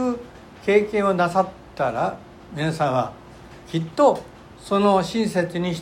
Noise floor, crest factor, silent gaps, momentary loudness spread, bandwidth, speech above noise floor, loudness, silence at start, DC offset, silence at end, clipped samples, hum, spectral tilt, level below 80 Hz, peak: -43 dBFS; 18 dB; none; 13 LU; 15.5 kHz; 22 dB; -22 LUFS; 0 s; under 0.1%; 0 s; under 0.1%; none; -6 dB/octave; -52 dBFS; -4 dBFS